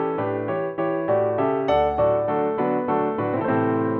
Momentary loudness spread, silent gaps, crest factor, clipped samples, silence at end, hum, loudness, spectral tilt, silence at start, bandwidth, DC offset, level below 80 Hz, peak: 5 LU; none; 14 dB; under 0.1%; 0 s; none; -22 LUFS; -9.5 dB/octave; 0 s; 5.6 kHz; under 0.1%; -50 dBFS; -8 dBFS